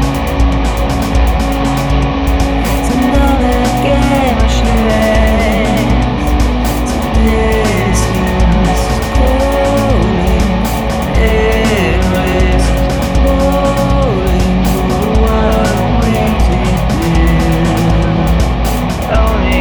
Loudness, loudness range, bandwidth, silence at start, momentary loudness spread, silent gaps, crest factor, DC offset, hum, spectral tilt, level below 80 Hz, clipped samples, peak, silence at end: -12 LUFS; 1 LU; over 20 kHz; 0 s; 3 LU; none; 10 dB; 0.5%; none; -6 dB/octave; -14 dBFS; under 0.1%; -2 dBFS; 0 s